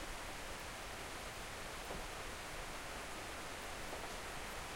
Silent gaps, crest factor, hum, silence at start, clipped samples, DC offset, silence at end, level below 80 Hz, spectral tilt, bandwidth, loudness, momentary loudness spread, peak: none; 14 dB; none; 0 s; under 0.1%; under 0.1%; 0 s; -54 dBFS; -2.5 dB/octave; 16 kHz; -46 LUFS; 1 LU; -34 dBFS